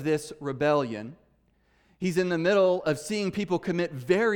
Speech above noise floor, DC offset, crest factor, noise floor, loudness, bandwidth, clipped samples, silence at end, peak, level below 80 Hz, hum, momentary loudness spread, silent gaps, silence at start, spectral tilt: 40 dB; under 0.1%; 16 dB; -66 dBFS; -27 LUFS; 18.5 kHz; under 0.1%; 0 s; -10 dBFS; -64 dBFS; none; 11 LU; none; 0 s; -6 dB/octave